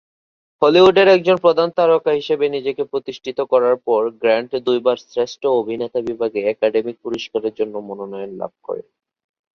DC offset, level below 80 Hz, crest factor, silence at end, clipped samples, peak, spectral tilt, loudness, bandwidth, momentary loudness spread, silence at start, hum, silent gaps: under 0.1%; -60 dBFS; 16 dB; 0.75 s; under 0.1%; -2 dBFS; -5.5 dB/octave; -17 LUFS; 7 kHz; 16 LU; 0.6 s; none; none